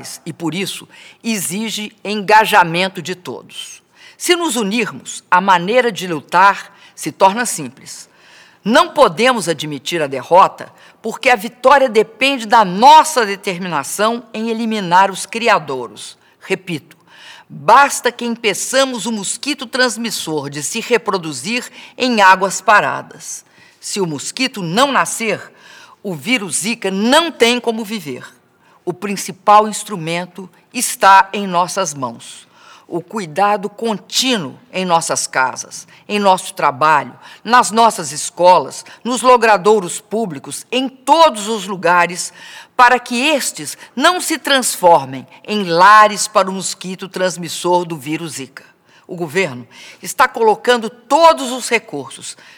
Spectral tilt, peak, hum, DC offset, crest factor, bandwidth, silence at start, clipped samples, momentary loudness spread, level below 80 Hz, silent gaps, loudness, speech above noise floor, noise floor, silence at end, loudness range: -3 dB/octave; 0 dBFS; none; under 0.1%; 16 dB; over 20 kHz; 0 s; 0.2%; 17 LU; -60 dBFS; none; -14 LUFS; 37 dB; -52 dBFS; 0.25 s; 6 LU